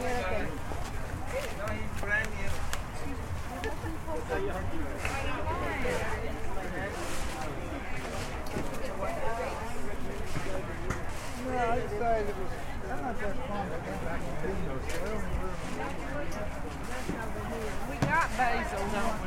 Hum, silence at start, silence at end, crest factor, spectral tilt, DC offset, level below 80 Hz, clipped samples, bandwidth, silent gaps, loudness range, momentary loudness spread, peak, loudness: none; 0 s; 0 s; 20 dB; -5 dB/octave; under 0.1%; -40 dBFS; under 0.1%; 16 kHz; none; 3 LU; 8 LU; -12 dBFS; -34 LUFS